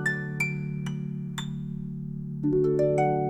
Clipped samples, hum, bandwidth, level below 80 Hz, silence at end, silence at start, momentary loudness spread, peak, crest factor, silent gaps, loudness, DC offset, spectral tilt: under 0.1%; none; 13 kHz; -54 dBFS; 0 s; 0 s; 12 LU; -14 dBFS; 14 dB; none; -29 LUFS; under 0.1%; -7 dB/octave